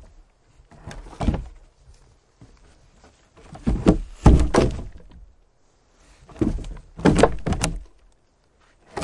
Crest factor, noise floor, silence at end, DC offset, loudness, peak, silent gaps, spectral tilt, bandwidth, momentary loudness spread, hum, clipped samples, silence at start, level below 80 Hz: 22 dB; -61 dBFS; 0 s; under 0.1%; -22 LUFS; -2 dBFS; none; -6.5 dB/octave; 11.5 kHz; 24 LU; none; under 0.1%; 0.85 s; -30 dBFS